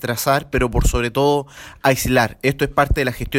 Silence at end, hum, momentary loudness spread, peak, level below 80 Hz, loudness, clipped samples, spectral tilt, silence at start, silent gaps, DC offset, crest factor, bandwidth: 0 s; none; 4 LU; -2 dBFS; -26 dBFS; -18 LUFS; under 0.1%; -5 dB/octave; 0 s; none; under 0.1%; 16 dB; 16.5 kHz